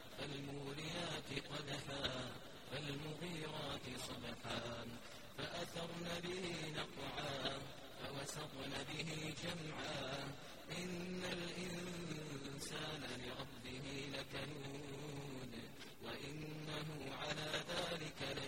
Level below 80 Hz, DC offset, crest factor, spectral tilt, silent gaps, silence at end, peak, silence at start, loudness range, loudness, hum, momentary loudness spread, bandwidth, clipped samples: -66 dBFS; 0.1%; 22 dB; -4 dB/octave; none; 0 s; -26 dBFS; 0 s; 3 LU; -47 LUFS; none; 7 LU; 16 kHz; under 0.1%